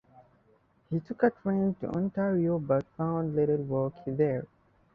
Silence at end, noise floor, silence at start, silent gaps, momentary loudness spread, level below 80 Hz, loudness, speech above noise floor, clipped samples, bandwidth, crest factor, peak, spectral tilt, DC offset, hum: 0.5 s; -66 dBFS; 0.2 s; none; 8 LU; -62 dBFS; -30 LUFS; 37 dB; under 0.1%; 4.9 kHz; 18 dB; -12 dBFS; -11.5 dB/octave; under 0.1%; none